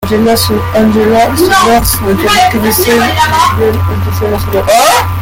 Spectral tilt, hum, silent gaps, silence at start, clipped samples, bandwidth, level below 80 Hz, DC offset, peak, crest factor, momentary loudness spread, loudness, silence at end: -4.5 dB/octave; none; none; 0 s; under 0.1%; 17.5 kHz; -26 dBFS; under 0.1%; 0 dBFS; 8 dB; 6 LU; -8 LUFS; 0 s